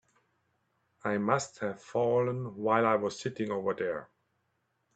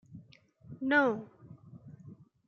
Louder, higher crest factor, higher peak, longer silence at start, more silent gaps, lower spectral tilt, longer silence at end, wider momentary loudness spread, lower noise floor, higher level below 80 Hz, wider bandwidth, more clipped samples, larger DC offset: about the same, -31 LUFS vs -30 LUFS; about the same, 22 dB vs 20 dB; first, -10 dBFS vs -14 dBFS; first, 1.05 s vs 0.1 s; neither; about the same, -6 dB/octave vs -7 dB/octave; first, 0.9 s vs 0.35 s; second, 10 LU vs 26 LU; first, -78 dBFS vs -59 dBFS; about the same, -74 dBFS vs -76 dBFS; first, 9 kHz vs 6.8 kHz; neither; neither